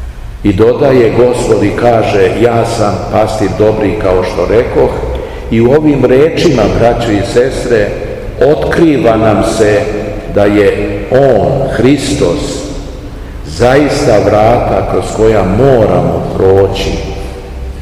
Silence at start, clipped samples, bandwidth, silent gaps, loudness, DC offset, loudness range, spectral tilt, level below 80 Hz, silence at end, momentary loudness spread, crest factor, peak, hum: 0 s; 3%; 14.5 kHz; none; -9 LUFS; 0.8%; 2 LU; -6.5 dB/octave; -24 dBFS; 0 s; 11 LU; 8 dB; 0 dBFS; none